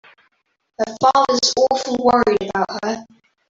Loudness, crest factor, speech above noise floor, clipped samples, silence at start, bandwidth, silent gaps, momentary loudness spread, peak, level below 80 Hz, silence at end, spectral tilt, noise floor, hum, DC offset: -17 LUFS; 16 dB; 47 dB; under 0.1%; 0.8 s; 7.8 kHz; none; 11 LU; -2 dBFS; -54 dBFS; 0.45 s; -3 dB/octave; -64 dBFS; none; under 0.1%